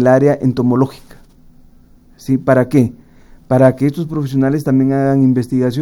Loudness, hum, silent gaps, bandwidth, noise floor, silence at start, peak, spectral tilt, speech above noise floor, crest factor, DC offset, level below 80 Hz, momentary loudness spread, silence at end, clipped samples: -14 LUFS; none; none; 12.5 kHz; -45 dBFS; 0 s; 0 dBFS; -8.5 dB/octave; 32 dB; 14 dB; under 0.1%; -44 dBFS; 7 LU; 0 s; under 0.1%